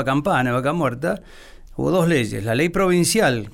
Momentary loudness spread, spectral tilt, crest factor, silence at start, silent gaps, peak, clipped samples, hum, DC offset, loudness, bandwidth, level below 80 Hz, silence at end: 9 LU; -5 dB/octave; 12 dB; 0 s; none; -8 dBFS; under 0.1%; none; under 0.1%; -20 LUFS; 17 kHz; -42 dBFS; 0.05 s